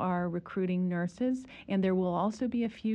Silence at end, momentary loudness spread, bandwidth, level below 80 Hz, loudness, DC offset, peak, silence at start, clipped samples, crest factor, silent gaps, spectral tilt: 0 s; 5 LU; 8.8 kHz; -64 dBFS; -32 LUFS; under 0.1%; -18 dBFS; 0 s; under 0.1%; 12 dB; none; -8 dB/octave